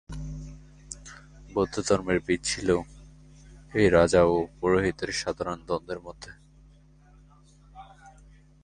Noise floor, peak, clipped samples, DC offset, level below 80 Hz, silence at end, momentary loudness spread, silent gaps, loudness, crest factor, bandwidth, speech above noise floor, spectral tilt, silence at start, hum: -55 dBFS; -6 dBFS; under 0.1%; under 0.1%; -46 dBFS; 0.55 s; 23 LU; none; -26 LUFS; 22 dB; 11 kHz; 30 dB; -5 dB/octave; 0.1 s; none